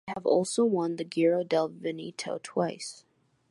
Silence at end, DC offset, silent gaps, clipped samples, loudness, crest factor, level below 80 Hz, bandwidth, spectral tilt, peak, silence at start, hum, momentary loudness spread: 0.55 s; under 0.1%; none; under 0.1%; -29 LUFS; 16 dB; -76 dBFS; 11.5 kHz; -5 dB/octave; -12 dBFS; 0.05 s; none; 11 LU